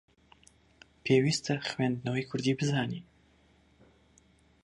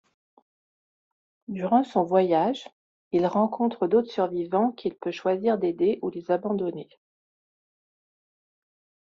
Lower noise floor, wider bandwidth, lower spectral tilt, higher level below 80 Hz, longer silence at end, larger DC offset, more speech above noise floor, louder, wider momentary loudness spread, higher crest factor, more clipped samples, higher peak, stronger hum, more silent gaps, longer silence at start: second, -64 dBFS vs under -90 dBFS; first, 11.5 kHz vs 7.4 kHz; about the same, -5.5 dB/octave vs -6 dB/octave; about the same, -66 dBFS vs -70 dBFS; second, 1.6 s vs 2.15 s; neither; second, 35 dB vs over 65 dB; second, -30 LUFS vs -25 LUFS; about the same, 10 LU vs 9 LU; about the same, 20 dB vs 20 dB; neither; second, -14 dBFS vs -8 dBFS; neither; second, none vs 2.72-3.11 s; second, 1.05 s vs 1.5 s